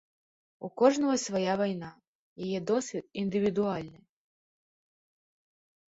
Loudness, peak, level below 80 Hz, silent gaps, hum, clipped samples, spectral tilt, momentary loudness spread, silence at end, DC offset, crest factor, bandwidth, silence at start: -30 LUFS; -10 dBFS; -70 dBFS; 2.08-2.36 s; none; under 0.1%; -5 dB/octave; 17 LU; 2 s; under 0.1%; 22 dB; 8 kHz; 0.6 s